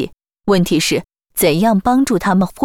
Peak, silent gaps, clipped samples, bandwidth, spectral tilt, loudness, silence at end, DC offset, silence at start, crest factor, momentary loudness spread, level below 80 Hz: -4 dBFS; none; under 0.1%; 20 kHz; -5 dB/octave; -15 LUFS; 0 s; under 0.1%; 0 s; 12 dB; 11 LU; -44 dBFS